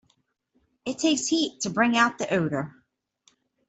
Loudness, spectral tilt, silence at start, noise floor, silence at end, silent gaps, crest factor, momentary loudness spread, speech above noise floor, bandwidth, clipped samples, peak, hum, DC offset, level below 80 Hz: -24 LUFS; -3.5 dB/octave; 0.85 s; -71 dBFS; 1 s; none; 22 dB; 14 LU; 46 dB; 8.4 kHz; under 0.1%; -6 dBFS; none; under 0.1%; -68 dBFS